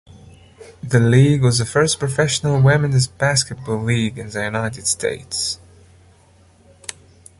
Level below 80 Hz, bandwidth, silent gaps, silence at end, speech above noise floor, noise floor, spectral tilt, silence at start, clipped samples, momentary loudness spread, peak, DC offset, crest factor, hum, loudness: -46 dBFS; 11.5 kHz; none; 0.5 s; 34 dB; -51 dBFS; -4.5 dB/octave; 0.15 s; under 0.1%; 15 LU; -2 dBFS; under 0.1%; 16 dB; none; -18 LUFS